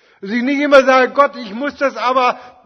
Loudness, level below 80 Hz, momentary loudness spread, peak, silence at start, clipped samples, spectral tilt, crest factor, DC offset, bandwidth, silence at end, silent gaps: -14 LUFS; -58 dBFS; 12 LU; 0 dBFS; 0.25 s; 0.2%; -4 dB/octave; 14 dB; under 0.1%; 7.8 kHz; 0.15 s; none